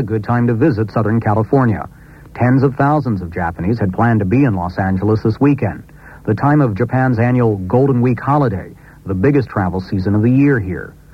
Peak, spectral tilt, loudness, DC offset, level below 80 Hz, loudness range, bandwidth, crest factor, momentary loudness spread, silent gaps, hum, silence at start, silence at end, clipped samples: 0 dBFS; -10 dB/octave; -15 LUFS; under 0.1%; -40 dBFS; 1 LU; 6 kHz; 14 dB; 10 LU; none; none; 0 s; 0.25 s; under 0.1%